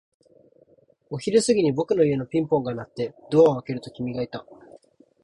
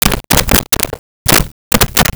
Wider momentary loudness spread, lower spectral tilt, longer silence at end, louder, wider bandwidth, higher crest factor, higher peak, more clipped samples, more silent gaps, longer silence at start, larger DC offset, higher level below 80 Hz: first, 14 LU vs 6 LU; first, -6 dB/octave vs -2.5 dB/octave; first, 0.45 s vs 0 s; second, -23 LUFS vs -11 LUFS; second, 11 kHz vs over 20 kHz; first, 18 dB vs 12 dB; second, -6 dBFS vs 0 dBFS; neither; second, none vs 0.99-1.25 s, 1.52-1.71 s; first, 1.1 s vs 0 s; neither; second, -60 dBFS vs -22 dBFS